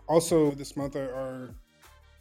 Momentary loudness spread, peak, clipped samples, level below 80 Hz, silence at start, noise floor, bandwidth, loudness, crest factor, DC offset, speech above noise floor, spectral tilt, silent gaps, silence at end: 17 LU; -8 dBFS; under 0.1%; -54 dBFS; 0.1 s; -57 dBFS; 16 kHz; -28 LUFS; 20 dB; under 0.1%; 29 dB; -5.5 dB/octave; none; 0.6 s